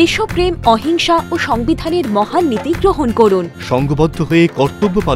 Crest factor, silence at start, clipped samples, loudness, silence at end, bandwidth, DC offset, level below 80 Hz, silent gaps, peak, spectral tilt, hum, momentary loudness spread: 14 dB; 0 s; under 0.1%; -14 LUFS; 0 s; 15.5 kHz; under 0.1%; -32 dBFS; none; 0 dBFS; -6 dB/octave; none; 4 LU